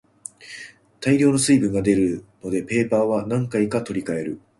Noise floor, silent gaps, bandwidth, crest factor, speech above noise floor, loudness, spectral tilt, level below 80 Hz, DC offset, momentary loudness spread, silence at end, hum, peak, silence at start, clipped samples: -42 dBFS; none; 11.5 kHz; 16 dB; 21 dB; -21 LUFS; -5.5 dB/octave; -52 dBFS; under 0.1%; 20 LU; 0.2 s; none; -6 dBFS; 0.4 s; under 0.1%